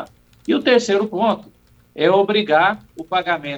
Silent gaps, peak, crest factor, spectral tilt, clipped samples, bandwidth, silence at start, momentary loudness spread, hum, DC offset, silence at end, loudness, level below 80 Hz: none; -2 dBFS; 16 dB; -4.5 dB/octave; under 0.1%; 9.2 kHz; 0 s; 13 LU; none; under 0.1%; 0 s; -18 LUFS; -58 dBFS